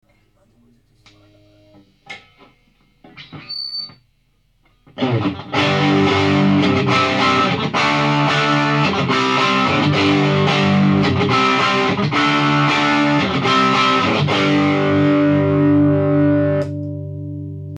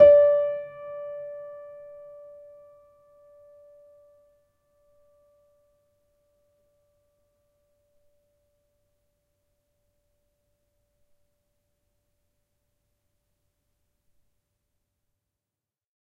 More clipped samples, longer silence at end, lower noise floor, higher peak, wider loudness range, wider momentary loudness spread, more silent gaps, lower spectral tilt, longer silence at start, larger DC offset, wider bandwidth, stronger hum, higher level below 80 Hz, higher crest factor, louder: neither; second, 0 s vs 14.55 s; second, -61 dBFS vs under -90 dBFS; about the same, -4 dBFS vs -4 dBFS; second, 17 LU vs 28 LU; second, 12 LU vs 29 LU; neither; about the same, -6 dB/octave vs -7 dB/octave; first, 2.1 s vs 0 s; neither; first, 9.6 kHz vs 3.7 kHz; neither; first, -54 dBFS vs -68 dBFS; second, 12 dB vs 26 dB; first, -15 LUFS vs -23 LUFS